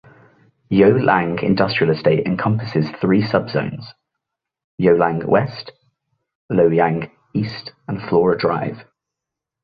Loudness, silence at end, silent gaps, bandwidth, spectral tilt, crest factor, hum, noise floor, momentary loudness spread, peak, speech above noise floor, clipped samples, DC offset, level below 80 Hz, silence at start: -18 LUFS; 0.8 s; 4.64-4.78 s, 6.35-6.49 s; 5.2 kHz; -9.5 dB/octave; 18 dB; none; -84 dBFS; 14 LU; -2 dBFS; 67 dB; under 0.1%; under 0.1%; -52 dBFS; 0.7 s